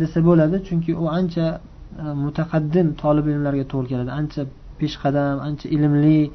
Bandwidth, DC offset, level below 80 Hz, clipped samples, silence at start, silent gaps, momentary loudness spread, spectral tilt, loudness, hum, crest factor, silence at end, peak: 6.2 kHz; under 0.1%; -42 dBFS; under 0.1%; 0 s; none; 12 LU; -9.5 dB/octave; -21 LUFS; none; 16 dB; 0 s; -4 dBFS